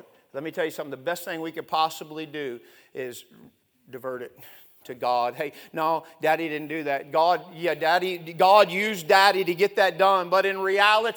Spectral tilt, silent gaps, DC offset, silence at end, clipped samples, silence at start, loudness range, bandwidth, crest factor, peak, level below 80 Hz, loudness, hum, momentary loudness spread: -3.5 dB/octave; none; under 0.1%; 0 s; under 0.1%; 0.35 s; 12 LU; over 20 kHz; 22 dB; -4 dBFS; -80 dBFS; -23 LUFS; none; 18 LU